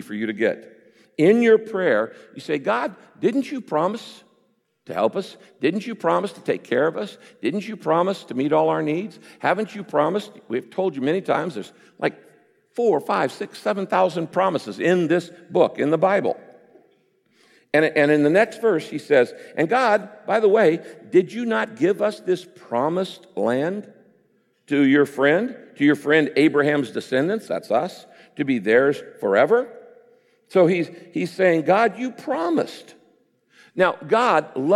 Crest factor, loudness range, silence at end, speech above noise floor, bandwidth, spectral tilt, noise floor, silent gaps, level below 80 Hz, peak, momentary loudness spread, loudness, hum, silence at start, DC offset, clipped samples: 16 dB; 5 LU; 0 s; 45 dB; 13 kHz; -6.5 dB/octave; -66 dBFS; none; -76 dBFS; -4 dBFS; 11 LU; -21 LUFS; none; 0 s; under 0.1%; under 0.1%